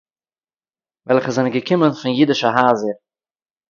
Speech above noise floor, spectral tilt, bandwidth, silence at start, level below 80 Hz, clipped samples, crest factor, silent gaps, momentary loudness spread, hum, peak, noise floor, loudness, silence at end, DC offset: over 74 dB; -6 dB/octave; 7.4 kHz; 1.05 s; -64 dBFS; under 0.1%; 18 dB; none; 6 LU; none; 0 dBFS; under -90 dBFS; -17 LUFS; 0.75 s; under 0.1%